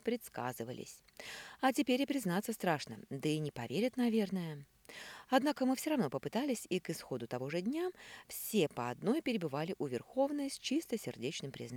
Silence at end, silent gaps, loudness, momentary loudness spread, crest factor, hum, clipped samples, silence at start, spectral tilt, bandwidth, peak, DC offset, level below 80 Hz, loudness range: 0 s; none; -37 LUFS; 14 LU; 20 dB; none; under 0.1%; 0.05 s; -5 dB/octave; 20 kHz; -16 dBFS; under 0.1%; -74 dBFS; 2 LU